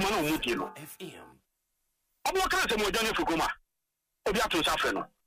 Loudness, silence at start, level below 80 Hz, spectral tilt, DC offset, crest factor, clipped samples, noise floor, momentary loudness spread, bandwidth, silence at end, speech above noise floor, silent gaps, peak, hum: -29 LUFS; 0 s; -50 dBFS; -3 dB/octave; under 0.1%; 14 dB; under 0.1%; -84 dBFS; 17 LU; 15.5 kHz; 0.2 s; 54 dB; none; -18 dBFS; none